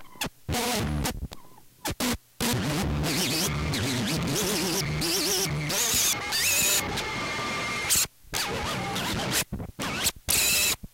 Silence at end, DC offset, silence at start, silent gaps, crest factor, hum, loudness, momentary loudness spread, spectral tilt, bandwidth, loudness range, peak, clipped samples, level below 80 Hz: 0.1 s; under 0.1%; 0 s; none; 18 dB; none; -26 LUFS; 9 LU; -2.5 dB/octave; 17 kHz; 4 LU; -10 dBFS; under 0.1%; -42 dBFS